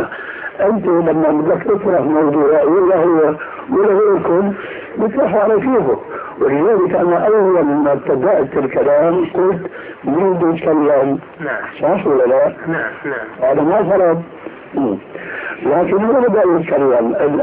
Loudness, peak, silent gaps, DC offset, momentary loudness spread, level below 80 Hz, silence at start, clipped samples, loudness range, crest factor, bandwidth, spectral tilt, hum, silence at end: -14 LUFS; -4 dBFS; none; under 0.1%; 11 LU; -52 dBFS; 0 s; under 0.1%; 2 LU; 10 dB; 3.7 kHz; -12 dB/octave; none; 0 s